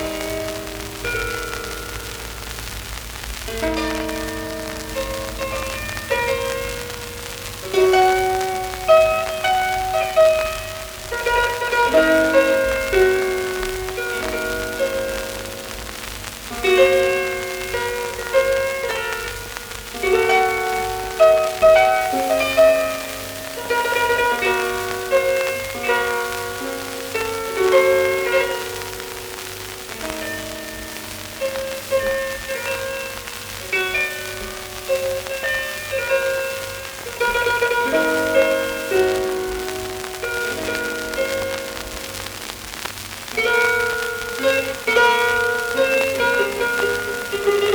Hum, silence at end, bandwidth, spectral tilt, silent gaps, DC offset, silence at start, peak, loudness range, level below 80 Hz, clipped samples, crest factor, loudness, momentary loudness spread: none; 0 s; over 20 kHz; -3 dB/octave; none; under 0.1%; 0 s; -4 dBFS; 8 LU; -40 dBFS; under 0.1%; 18 dB; -20 LUFS; 14 LU